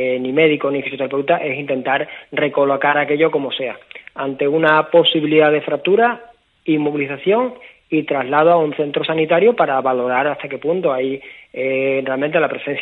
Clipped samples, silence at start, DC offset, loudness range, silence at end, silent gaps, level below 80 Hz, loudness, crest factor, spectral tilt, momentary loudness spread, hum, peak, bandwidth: under 0.1%; 0 s; under 0.1%; 3 LU; 0 s; none; -66 dBFS; -17 LUFS; 18 dB; -8 dB/octave; 11 LU; none; 0 dBFS; 4.2 kHz